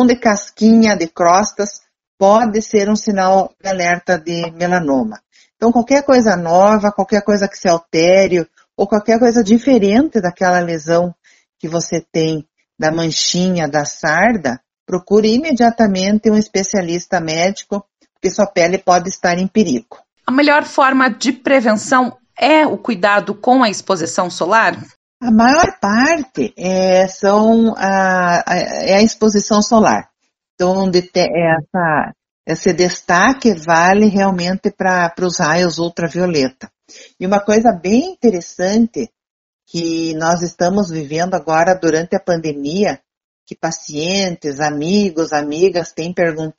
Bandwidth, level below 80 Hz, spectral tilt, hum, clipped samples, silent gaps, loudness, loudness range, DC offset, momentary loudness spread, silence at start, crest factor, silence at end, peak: 8.2 kHz; -48 dBFS; -4.5 dB/octave; none; under 0.1%; 2.07-2.18 s, 14.80-14.86 s, 24.96-25.20 s, 30.50-30.58 s, 32.31-32.44 s, 39.30-39.59 s, 43.17-43.46 s; -14 LUFS; 4 LU; under 0.1%; 9 LU; 0 s; 14 dB; 0.1 s; 0 dBFS